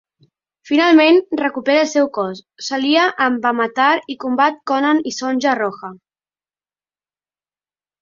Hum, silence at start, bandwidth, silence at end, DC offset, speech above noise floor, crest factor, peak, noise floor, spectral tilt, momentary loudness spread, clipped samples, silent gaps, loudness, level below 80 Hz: none; 0.65 s; 7.6 kHz; 2.05 s; under 0.1%; over 74 dB; 16 dB; -2 dBFS; under -90 dBFS; -3.5 dB/octave; 12 LU; under 0.1%; none; -16 LUFS; -66 dBFS